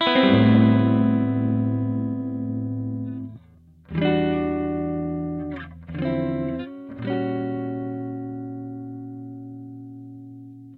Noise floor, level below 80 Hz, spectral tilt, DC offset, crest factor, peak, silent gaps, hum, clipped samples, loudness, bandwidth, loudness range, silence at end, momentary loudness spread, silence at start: -51 dBFS; -50 dBFS; -9.5 dB/octave; under 0.1%; 20 dB; -4 dBFS; none; none; under 0.1%; -23 LUFS; 4.9 kHz; 9 LU; 0 s; 21 LU; 0 s